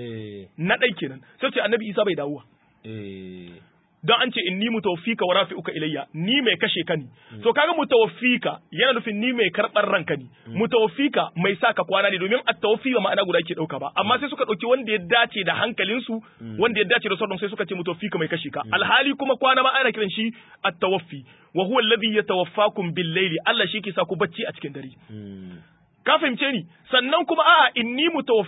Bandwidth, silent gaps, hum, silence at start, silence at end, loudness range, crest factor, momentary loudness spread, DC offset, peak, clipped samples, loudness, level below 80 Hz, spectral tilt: 4 kHz; none; none; 0 s; 0 s; 4 LU; 20 dB; 14 LU; under 0.1%; -4 dBFS; under 0.1%; -22 LUFS; -68 dBFS; -9.5 dB/octave